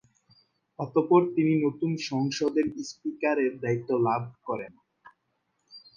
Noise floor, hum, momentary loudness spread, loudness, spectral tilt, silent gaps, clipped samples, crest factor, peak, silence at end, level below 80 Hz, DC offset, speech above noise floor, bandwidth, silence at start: -76 dBFS; none; 13 LU; -27 LUFS; -6.5 dB/octave; none; under 0.1%; 22 dB; -8 dBFS; 0.2 s; -70 dBFS; under 0.1%; 50 dB; 7.4 kHz; 0.8 s